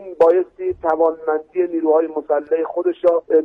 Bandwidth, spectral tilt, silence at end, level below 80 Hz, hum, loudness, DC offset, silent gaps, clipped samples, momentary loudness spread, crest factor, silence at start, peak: 3.8 kHz; -8 dB/octave; 0 s; -58 dBFS; none; -18 LUFS; under 0.1%; none; under 0.1%; 7 LU; 14 dB; 0 s; -4 dBFS